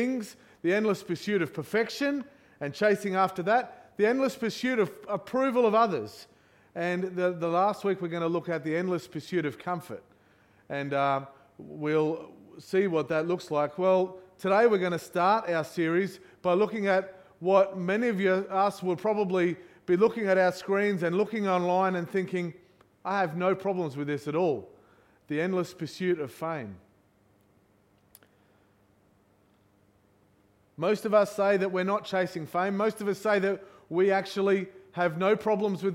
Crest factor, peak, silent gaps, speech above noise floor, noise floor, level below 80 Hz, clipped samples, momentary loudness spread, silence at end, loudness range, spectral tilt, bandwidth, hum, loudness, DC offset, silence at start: 20 dB; -10 dBFS; none; 37 dB; -65 dBFS; -74 dBFS; under 0.1%; 11 LU; 0 s; 6 LU; -6.5 dB/octave; 16 kHz; none; -28 LUFS; under 0.1%; 0 s